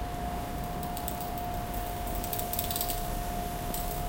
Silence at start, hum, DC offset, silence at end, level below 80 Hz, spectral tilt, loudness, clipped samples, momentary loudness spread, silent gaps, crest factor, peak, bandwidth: 0 s; none; under 0.1%; 0 s; -38 dBFS; -4 dB/octave; -34 LUFS; under 0.1%; 5 LU; none; 24 dB; -10 dBFS; 17.5 kHz